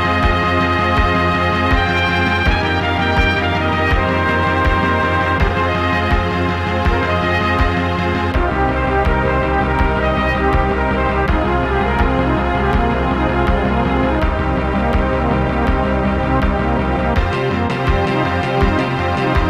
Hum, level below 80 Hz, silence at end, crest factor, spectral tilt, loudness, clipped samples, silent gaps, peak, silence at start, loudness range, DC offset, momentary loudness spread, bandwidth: none; -22 dBFS; 0 s; 14 dB; -7 dB/octave; -16 LUFS; under 0.1%; none; -2 dBFS; 0 s; 2 LU; under 0.1%; 3 LU; 11 kHz